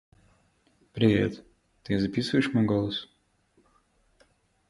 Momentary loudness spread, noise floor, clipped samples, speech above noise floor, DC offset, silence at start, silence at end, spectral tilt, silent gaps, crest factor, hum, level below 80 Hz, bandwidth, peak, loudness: 22 LU; -67 dBFS; under 0.1%; 42 dB; under 0.1%; 0.95 s; 1.65 s; -7 dB/octave; none; 22 dB; none; -56 dBFS; 11.5 kHz; -8 dBFS; -27 LUFS